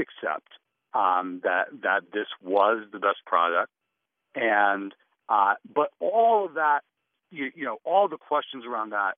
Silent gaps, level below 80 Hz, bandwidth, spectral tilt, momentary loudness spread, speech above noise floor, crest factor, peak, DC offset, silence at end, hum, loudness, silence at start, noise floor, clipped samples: none; -88 dBFS; 4.1 kHz; -0.5 dB/octave; 11 LU; 57 dB; 20 dB; -6 dBFS; under 0.1%; 0 s; none; -25 LUFS; 0 s; -82 dBFS; under 0.1%